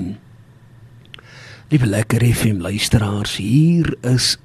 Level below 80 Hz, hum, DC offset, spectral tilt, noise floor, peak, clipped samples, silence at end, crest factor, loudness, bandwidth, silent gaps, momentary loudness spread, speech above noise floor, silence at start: -36 dBFS; none; under 0.1%; -5 dB/octave; -45 dBFS; -2 dBFS; under 0.1%; 0.1 s; 16 dB; -17 LUFS; 13.5 kHz; none; 8 LU; 29 dB; 0 s